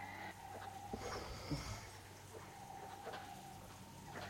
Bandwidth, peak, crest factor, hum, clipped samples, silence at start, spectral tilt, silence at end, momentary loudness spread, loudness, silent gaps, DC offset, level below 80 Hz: 16.5 kHz; -30 dBFS; 20 dB; none; under 0.1%; 0 s; -4.5 dB/octave; 0 s; 9 LU; -50 LUFS; none; under 0.1%; -62 dBFS